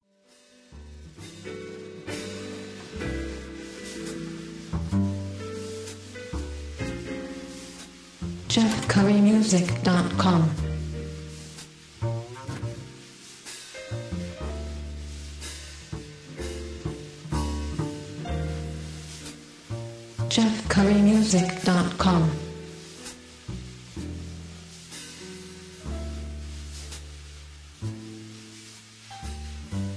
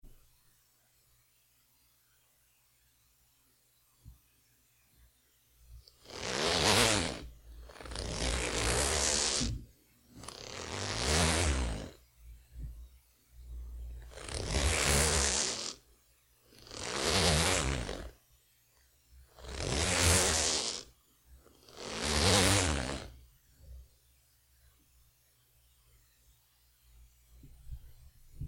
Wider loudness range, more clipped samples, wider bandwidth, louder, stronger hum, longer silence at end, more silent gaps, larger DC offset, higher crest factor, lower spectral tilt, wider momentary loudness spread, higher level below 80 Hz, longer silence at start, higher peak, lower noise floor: first, 16 LU vs 5 LU; neither; second, 11 kHz vs 17 kHz; first, -27 LUFS vs -30 LUFS; neither; about the same, 0 s vs 0 s; neither; neither; second, 20 dB vs 26 dB; first, -5.5 dB/octave vs -2.5 dB/octave; about the same, 21 LU vs 23 LU; about the same, -42 dBFS vs -44 dBFS; first, 0.7 s vs 0.05 s; about the same, -10 dBFS vs -10 dBFS; second, -59 dBFS vs -70 dBFS